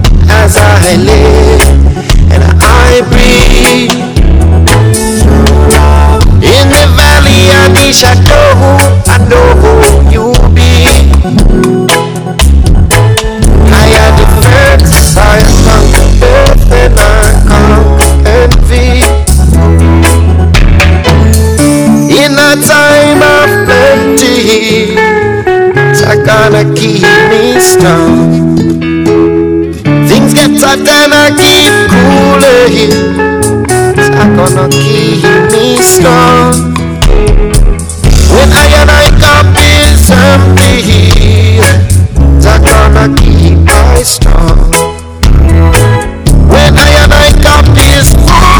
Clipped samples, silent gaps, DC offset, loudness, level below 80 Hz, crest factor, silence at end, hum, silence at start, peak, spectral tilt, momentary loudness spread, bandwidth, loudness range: 30%; none; under 0.1%; -4 LUFS; -8 dBFS; 4 dB; 0 s; none; 0 s; 0 dBFS; -5 dB/octave; 5 LU; over 20 kHz; 2 LU